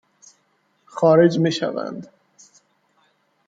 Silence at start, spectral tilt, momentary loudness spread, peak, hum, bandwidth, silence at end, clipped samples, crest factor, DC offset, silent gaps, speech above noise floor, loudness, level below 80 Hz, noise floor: 0.95 s; -6.5 dB/octave; 21 LU; -2 dBFS; none; 7.8 kHz; 1.4 s; under 0.1%; 20 dB; under 0.1%; none; 48 dB; -19 LUFS; -66 dBFS; -66 dBFS